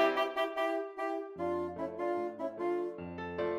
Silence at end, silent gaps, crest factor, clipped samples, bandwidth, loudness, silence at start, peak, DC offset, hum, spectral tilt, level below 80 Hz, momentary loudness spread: 0 s; none; 18 dB; under 0.1%; 14.5 kHz; -36 LUFS; 0 s; -16 dBFS; under 0.1%; none; -6 dB/octave; -70 dBFS; 6 LU